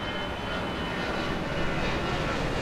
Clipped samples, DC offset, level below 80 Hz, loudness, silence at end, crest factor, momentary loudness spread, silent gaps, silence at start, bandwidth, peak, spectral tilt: under 0.1%; under 0.1%; -38 dBFS; -30 LUFS; 0 s; 14 dB; 3 LU; none; 0 s; 14.5 kHz; -16 dBFS; -5.5 dB/octave